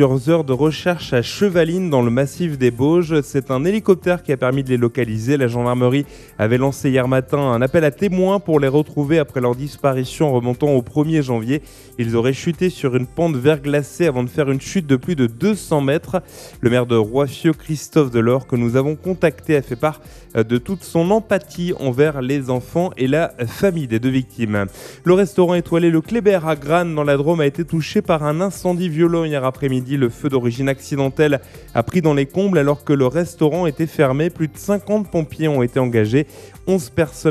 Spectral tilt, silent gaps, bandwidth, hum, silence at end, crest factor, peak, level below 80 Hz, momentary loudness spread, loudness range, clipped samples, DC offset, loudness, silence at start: -7 dB/octave; none; 14 kHz; none; 0 s; 18 dB; 0 dBFS; -46 dBFS; 6 LU; 2 LU; under 0.1%; under 0.1%; -18 LUFS; 0 s